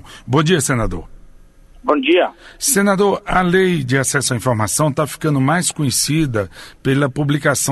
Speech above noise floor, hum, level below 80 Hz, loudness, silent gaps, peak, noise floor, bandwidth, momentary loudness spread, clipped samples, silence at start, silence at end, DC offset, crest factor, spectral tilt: 27 dB; none; -36 dBFS; -16 LUFS; none; -2 dBFS; -43 dBFS; 12.5 kHz; 7 LU; under 0.1%; 0.05 s; 0 s; under 0.1%; 16 dB; -4.5 dB/octave